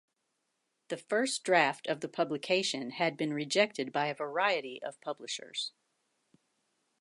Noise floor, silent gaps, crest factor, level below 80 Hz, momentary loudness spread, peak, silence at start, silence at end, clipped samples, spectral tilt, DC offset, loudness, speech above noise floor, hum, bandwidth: -81 dBFS; none; 22 dB; -88 dBFS; 13 LU; -12 dBFS; 0.9 s; 1.3 s; under 0.1%; -3 dB/octave; under 0.1%; -32 LUFS; 49 dB; none; 11.5 kHz